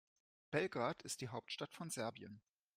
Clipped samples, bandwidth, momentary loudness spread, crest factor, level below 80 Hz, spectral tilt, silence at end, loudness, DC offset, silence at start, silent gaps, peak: under 0.1%; 15.5 kHz; 15 LU; 22 dB; -80 dBFS; -4 dB/octave; 0.4 s; -44 LUFS; under 0.1%; 0.5 s; none; -24 dBFS